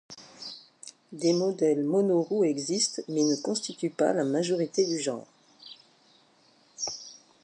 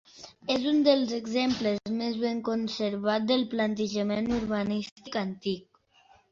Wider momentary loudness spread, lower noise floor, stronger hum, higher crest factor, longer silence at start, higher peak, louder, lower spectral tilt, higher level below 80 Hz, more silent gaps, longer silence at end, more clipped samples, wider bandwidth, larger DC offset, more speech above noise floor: first, 21 LU vs 10 LU; about the same, -62 dBFS vs -61 dBFS; neither; about the same, 18 dB vs 18 dB; about the same, 0.1 s vs 0.15 s; about the same, -12 dBFS vs -10 dBFS; about the same, -27 LUFS vs -28 LUFS; about the same, -4.5 dB/octave vs -5.5 dB/octave; second, -80 dBFS vs -58 dBFS; second, none vs 4.92-4.96 s; second, 0.3 s vs 0.7 s; neither; first, 11 kHz vs 7.6 kHz; neither; about the same, 35 dB vs 34 dB